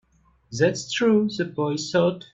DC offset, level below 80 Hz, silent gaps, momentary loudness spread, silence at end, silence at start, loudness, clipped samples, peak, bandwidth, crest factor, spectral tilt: under 0.1%; -62 dBFS; none; 6 LU; 0.15 s; 0.5 s; -23 LUFS; under 0.1%; -8 dBFS; 8.2 kHz; 16 dB; -5 dB/octave